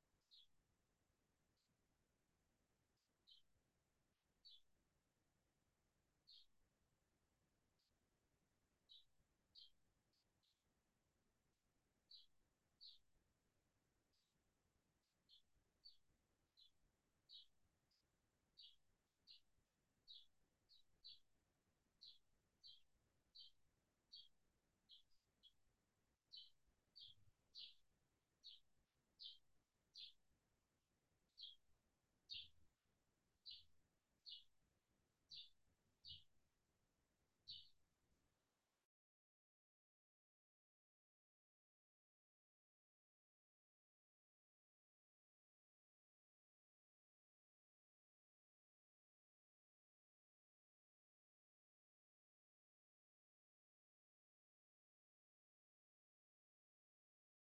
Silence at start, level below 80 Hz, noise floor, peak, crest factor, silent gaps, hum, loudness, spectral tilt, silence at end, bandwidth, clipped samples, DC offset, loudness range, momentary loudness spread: 0 s; under -90 dBFS; under -90 dBFS; -42 dBFS; 30 dB; none; none; -63 LUFS; 0.5 dB/octave; 18.55 s; 6 kHz; under 0.1%; under 0.1%; 6 LU; 9 LU